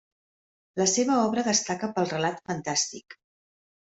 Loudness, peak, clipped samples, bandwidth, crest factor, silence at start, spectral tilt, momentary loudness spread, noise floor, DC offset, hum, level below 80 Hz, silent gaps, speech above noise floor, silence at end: -26 LUFS; -8 dBFS; under 0.1%; 8.2 kHz; 20 dB; 0.75 s; -3 dB/octave; 9 LU; under -90 dBFS; under 0.1%; none; -68 dBFS; none; over 64 dB; 0.8 s